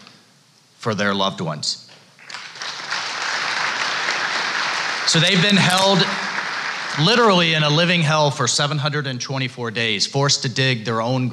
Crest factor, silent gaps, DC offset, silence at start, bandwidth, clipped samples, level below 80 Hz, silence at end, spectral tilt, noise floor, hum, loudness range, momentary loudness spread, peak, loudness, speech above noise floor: 16 dB; none; under 0.1%; 0 s; 13.5 kHz; under 0.1%; -64 dBFS; 0 s; -3.5 dB/octave; -54 dBFS; none; 7 LU; 11 LU; -4 dBFS; -18 LUFS; 35 dB